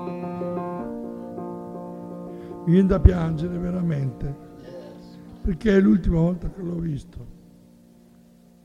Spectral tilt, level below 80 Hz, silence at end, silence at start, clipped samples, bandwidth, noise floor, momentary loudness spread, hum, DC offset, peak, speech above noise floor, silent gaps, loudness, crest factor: -9.5 dB/octave; -32 dBFS; 1.25 s; 0 s; under 0.1%; 8.8 kHz; -52 dBFS; 22 LU; none; under 0.1%; -2 dBFS; 32 dB; none; -24 LUFS; 24 dB